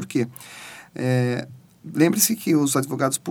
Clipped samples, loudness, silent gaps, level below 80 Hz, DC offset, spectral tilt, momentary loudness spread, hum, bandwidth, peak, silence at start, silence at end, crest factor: under 0.1%; -22 LUFS; none; -70 dBFS; under 0.1%; -4.5 dB/octave; 20 LU; none; 19.5 kHz; -4 dBFS; 0 s; 0 s; 20 dB